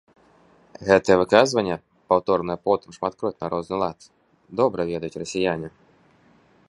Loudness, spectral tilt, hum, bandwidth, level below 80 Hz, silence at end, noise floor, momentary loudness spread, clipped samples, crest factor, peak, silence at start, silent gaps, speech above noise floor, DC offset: -23 LUFS; -5 dB/octave; none; 11.5 kHz; -56 dBFS; 1 s; -57 dBFS; 13 LU; under 0.1%; 24 dB; 0 dBFS; 0.8 s; none; 35 dB; under 0.1%